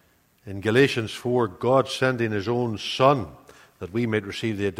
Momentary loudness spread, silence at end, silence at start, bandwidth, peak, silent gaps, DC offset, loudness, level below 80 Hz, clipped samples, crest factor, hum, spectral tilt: 10 LU; 0 s; 0.45 s; 15.5 kHz; -4 dBFS; none; under 0.1%; -24 LUFS; -58 dBFS; under 0.1%; 20 dB; none; -6 dB/octave